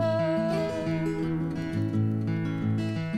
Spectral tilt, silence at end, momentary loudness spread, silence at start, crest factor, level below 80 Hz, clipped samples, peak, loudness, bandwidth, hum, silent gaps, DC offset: -8 dB/octave; 0 s; 3 LU; 0 s; 12 dB; -54 dBFS; under 0.1%; -16 dBFS; -28 LUFS; 10.5 kHz; none; none; under 0.1%